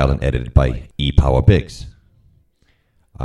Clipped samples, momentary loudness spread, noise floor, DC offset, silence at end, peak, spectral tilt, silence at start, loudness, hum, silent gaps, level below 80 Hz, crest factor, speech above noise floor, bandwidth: under 0.1%; 12 LU; -60 dBFS; under 0.1%; 0 s; 0 dBFS; -7.5 dB/octave; 0 s; -17 LUFS; none; none; -22 dBFS; 18 dB; 45 dB; 10.5 kHz